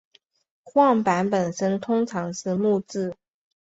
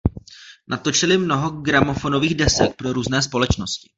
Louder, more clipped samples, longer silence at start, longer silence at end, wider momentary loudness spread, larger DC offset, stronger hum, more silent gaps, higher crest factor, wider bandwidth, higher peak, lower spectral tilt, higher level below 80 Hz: second, -23 LUFS vs -19 LUFS; neither; first, 0.65 s vs 0.05 s; first, 0.5 s vs 0.2 s; about the same, 10 LU vs 8 LU; neither; neither; neither; about the same, 18 dB vs 18 dB; about the same, 8 kHz vs 8.2 kHz; second, -6 dBFS vs -2 dBFS; first, -6 dB/octave vs -4 dB/octave; second, -66 dBFS vs -36 dBFS